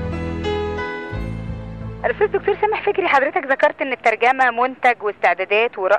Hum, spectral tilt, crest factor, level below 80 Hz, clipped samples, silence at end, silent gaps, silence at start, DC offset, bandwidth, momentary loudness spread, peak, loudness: none; -6 dB/octave; 16 dB; -40 dBFS; under 0.1%; 0 s; none; 0 s; under 0.1%; 9.8 kHz; 11 LU; -4 dBFS; -19 LUFS